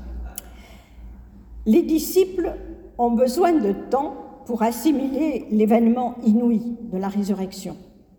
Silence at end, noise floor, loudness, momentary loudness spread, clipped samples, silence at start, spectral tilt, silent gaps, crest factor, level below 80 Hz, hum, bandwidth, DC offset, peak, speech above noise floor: 0.35 s; -44 dBFS; -21 LUFS; 17 LU; under 0.1%; 0 s; -6.5 dB/octave; none; 16 dB; -44 dBFS; none; over 20 kHz; under 0.1%; -6 dBFS; 24 dB